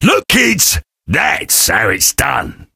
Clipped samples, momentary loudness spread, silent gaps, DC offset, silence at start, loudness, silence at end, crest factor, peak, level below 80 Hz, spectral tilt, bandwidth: under 0.1%; 8 LU; none; under 0.1%; 0 s; -11 LUFS; 0.1 s; 14 dB; 0 dBFS; -32 dBFS; -2 dB/octave; over 20 kHz